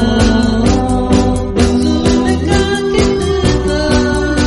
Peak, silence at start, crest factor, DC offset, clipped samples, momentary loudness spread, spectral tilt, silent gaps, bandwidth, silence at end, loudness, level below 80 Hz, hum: 0 dBFS; 0 s; 12 dB; under 0.1%; under 0.1%; 2 LU; -5.5 dB/octave; none; 11.5 kHz; 0 s; -13 LUFS; -20 dBFS; none